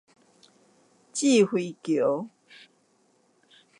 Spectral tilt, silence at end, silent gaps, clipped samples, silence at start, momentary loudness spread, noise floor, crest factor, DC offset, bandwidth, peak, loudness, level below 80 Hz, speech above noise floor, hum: -4.5 dB/octave; 1.5 s; none; under 0.1%; 1.15 s; 13 LU; -66 dBFS; 18 dB; under 0.1%; 11.5 kHz; -10 dBFS; -25 LUFS; -82 dBFS; 42 dB; none